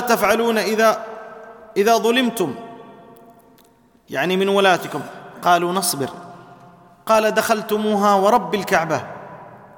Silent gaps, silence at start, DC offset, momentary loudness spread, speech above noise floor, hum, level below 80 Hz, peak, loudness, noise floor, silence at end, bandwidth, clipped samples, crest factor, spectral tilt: none; 0 s; under 0.1%; 20 LU; 36 dB; none; -60 dBFS; -2 dBFS; -18 LUFS; -54 dBFS; 0.2 s; 19 kHz; under 0.1%; 18 dB; -4 dB/octave